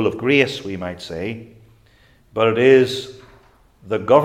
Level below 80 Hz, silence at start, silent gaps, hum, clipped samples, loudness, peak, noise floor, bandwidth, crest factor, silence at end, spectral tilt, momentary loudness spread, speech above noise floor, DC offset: -56 dBFS; 0 s; none; none; under 0.1%; -18 LUFS; 0 dBFS; -53 dBFS; 12.5 kHz; 20 dB; 0 s; -6 dB/octave; 16 LU; 36 dB; under 0.1%